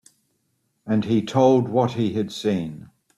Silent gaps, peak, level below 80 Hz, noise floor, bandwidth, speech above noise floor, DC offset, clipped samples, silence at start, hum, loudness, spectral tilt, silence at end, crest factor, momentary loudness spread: none; -4 dBFS; -60 dBFS; -71 dBFS; 12.5 kHz; 50 dB; under 0.1%; under 0.1%; 0.85 s; none; -21 LUFS; -7 dB/octave; 0.3 s; 18 dB; 15 LU